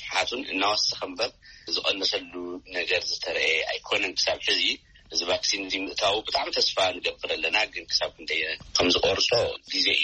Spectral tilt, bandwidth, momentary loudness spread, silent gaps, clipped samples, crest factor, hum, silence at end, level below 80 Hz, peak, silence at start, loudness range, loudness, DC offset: -1.5 dB/octave; 8.4 kHz; 8 LU; none; under 0.1%; 20 dB; none; 0 s; -56 dBFS; -8 dBFS; 0 s; 2 LU; -25 LUFS; under 0.1%